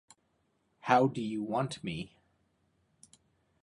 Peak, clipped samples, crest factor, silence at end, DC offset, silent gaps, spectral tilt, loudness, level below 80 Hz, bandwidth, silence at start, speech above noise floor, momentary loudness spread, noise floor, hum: -10 dBFS; under 0.1%; 26 dB; 1.55 s; under 0.1%; none; -6 dB/octave; -32 LUFS; -70 dBFS; 11.5 kHz; 0.85 s; 45 dB; 16 LU; -75 dBFS; none